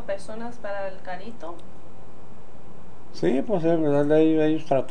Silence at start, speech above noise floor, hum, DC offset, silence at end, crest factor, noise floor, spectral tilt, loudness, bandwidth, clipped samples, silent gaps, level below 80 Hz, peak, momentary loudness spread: 0 s; 24 dB; none; 6%; 0 s; 18 dB; -48 dBFS; -7.5 dB/octave; -24 LUFS; 9.8 kHz; under 0.1%; none; -58 dBFS; -8 dBFS; 20 LU